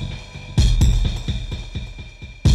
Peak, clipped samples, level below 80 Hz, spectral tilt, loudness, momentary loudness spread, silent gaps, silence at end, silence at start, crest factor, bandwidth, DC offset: -6 dBFS; under 0.1%; -22 dBFS; -5.5 dB/octave; -22 LUFS; 18 LU; none; 0 s; 0 s; 14 dB; 13 kHz; under 0.1%